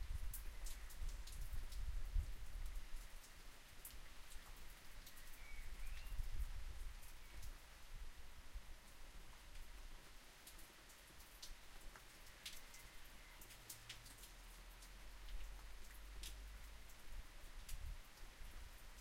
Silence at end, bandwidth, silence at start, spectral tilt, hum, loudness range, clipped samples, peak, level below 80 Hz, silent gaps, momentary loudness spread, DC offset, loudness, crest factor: 0 s; 16 kHz; 0 s; -3 dB/octave; none; 7 LU; under 0.1%; -30 dBFS; -52 dBFS; none; 9 LU; under 0.1%; -57 LUFS; 20 dB